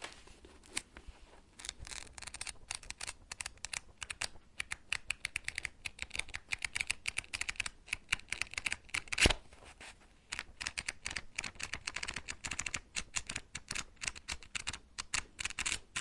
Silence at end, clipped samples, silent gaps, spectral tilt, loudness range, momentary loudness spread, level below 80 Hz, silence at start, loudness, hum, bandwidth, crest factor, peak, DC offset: 0 s; under 0.1%; none; -1 dB/octave; 8 LU; 10 LU; -52 dBFS; 0 s; -39 LUFS; none; 11.5 kHz; 32 dB; -10 dBFS; under 0.1%